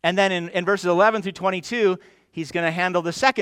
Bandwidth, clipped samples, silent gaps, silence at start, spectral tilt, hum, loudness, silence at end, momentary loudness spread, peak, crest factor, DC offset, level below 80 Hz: 15 kHz; under 0.1%; none; 0.05 s; -4.5 dB/octave; none; -22 LUFS; 0 s; 10 LU; 0 dBFS; 20 dB; under 0.1%; -64 dBFS